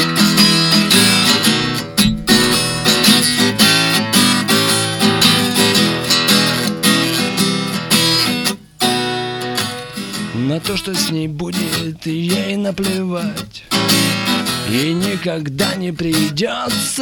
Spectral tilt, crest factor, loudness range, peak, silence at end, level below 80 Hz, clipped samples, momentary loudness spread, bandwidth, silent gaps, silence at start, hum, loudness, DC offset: -3 dB/octave; 16 dB; 8 LU; 0 dBFS; 0 s; -44 dBFS; under 0.1%; 10 LU; 19 kHz; none; 0 s; none; -14 LUFS; under 0.1%